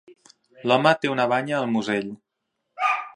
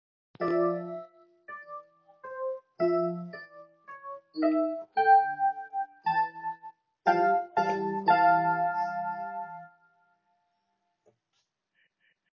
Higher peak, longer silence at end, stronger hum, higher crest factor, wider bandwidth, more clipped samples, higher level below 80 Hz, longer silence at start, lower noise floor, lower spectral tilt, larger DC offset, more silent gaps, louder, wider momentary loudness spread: first, -2 dBFS vs -10 dBFS; second, 0.05 s vs 2.65 s; neither; about the same, 22 dB vs 20 dB; first, 10.5 kHz vs 6.6 kHz; neither; first, -72 dBFS vs -84 dBFS; second, 0.1 s vs 0.4 s; about the same, -79 dBFS vs -78 dBFS; about the same, -5.5 dB/octave vs -4.5 dB/octave; neither; neither; first, -23 LUFS vs -28 LUFS; second, 9 LU vs 23 LU